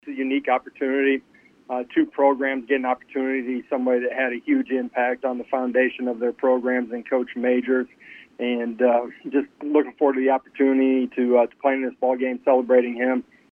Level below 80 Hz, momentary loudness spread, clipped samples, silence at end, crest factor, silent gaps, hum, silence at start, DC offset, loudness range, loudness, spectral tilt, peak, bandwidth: -70 dBFS; 6 LU; under 0.1%; 0.3 s; 16 dB; none; none; 0.05 s; under 0.1%; 3 LU; -22 LUFS; -7 dB/octave; -6 dBFS; 3.5 kHz